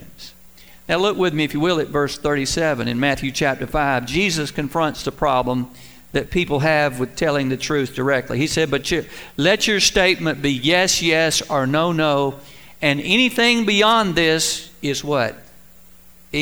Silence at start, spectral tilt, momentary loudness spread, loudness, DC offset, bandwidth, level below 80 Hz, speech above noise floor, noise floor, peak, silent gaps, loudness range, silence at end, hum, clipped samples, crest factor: 0 s; -3.5 dB/octave; 9 LU; -19 LUFS; 0.5%; over 20 kHz; -42 dBFS; 29 dB; -48 dBFS; -2 dBFS; none; 4 LU; 0 s; none; under 0.1%; 18 dB